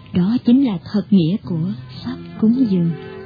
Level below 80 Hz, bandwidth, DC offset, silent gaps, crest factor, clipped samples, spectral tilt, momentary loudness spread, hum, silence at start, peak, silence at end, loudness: -52 dBFS; 5 kHz; under 0.1%; none; 14 dB; under 0.1%; -10 dB/octave; 14 LU; none; 0.1 s; -4 dBFS; 0 s; -18 LUFS